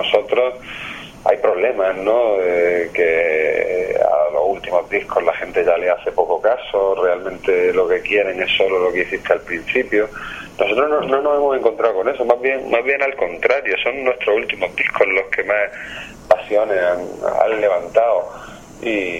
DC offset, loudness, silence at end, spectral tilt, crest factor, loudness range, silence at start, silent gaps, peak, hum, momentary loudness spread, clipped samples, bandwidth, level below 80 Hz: under 0.1%; -17 LUFS; 0 s; -4.5 dB/octave; 18 dB; 1 LU; 0 s; none; 0 dBFS; none; 6 LU; under 0.1%; 9.8 kHz; -48 dBFS